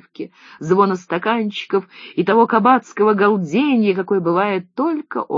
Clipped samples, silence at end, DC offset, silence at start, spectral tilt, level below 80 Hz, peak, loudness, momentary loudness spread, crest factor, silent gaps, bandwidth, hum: under 0.1%; 0 s; under 0.1%; 0.2 s; -7 dB/octave; -68 dBFS; 0 dBFS; -17 LUFS; 10 LU; 16 dB; none; 7.6 kHz; none